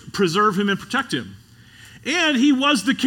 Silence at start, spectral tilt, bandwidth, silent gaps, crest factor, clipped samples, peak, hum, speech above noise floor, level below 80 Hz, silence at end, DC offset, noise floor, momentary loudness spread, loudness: 0.05 s; -4 dB/octave; 17.5 kHz; none; 16 dB; under 0.1%; -4 dBFS; none; 27 dB; -60 dBFS; 0 s; under 0.1%; -46 dBFS; 11 LU; -19 LUFS